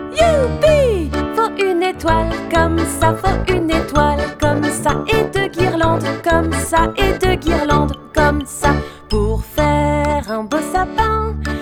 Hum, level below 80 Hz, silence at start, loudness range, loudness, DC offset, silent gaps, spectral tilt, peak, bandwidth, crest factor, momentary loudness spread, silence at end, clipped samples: none; -26 dBFS; 0 s; 1 LU; -16 LUFS; under 0.1%; none; -5.5 dB/octave; 0 dBFS; 19 kHz; 16 dB; 5 LU; 0 s; under 0.1%